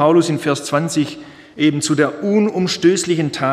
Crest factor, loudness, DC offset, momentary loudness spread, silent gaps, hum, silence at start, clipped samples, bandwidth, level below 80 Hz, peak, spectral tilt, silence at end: 14 dB; -17 LUFS; under 0.1%; 6 LU; none; none; 0 s; under 0.1%; 14 kHz; -60 dBFS; -2 dBFS; -5 dB/octave; 0 s